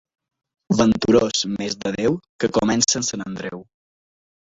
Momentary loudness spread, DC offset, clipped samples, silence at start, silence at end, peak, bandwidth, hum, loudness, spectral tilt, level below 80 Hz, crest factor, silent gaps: 13 LU; under 0.1%; under 0.1%; 0.7 s; 0.85 s; -2 dBFS; 8 kHz; none; -20 LUFS; -4 dB/octave; -48 dBFS; 20 dB; 2.29-2.39 s